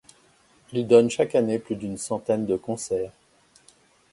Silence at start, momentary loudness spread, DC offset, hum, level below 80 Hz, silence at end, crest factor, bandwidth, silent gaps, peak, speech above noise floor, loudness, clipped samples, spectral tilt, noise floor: 0.7 s; 13 LU; under 0.1%; none; -62 dBFS; 1 s; 22 dB; 11.5 kHz; none; -4 dBFS; 36 dB; -24 LUFS; under 0.1%; -5.5 dB/octave; -59 dBFS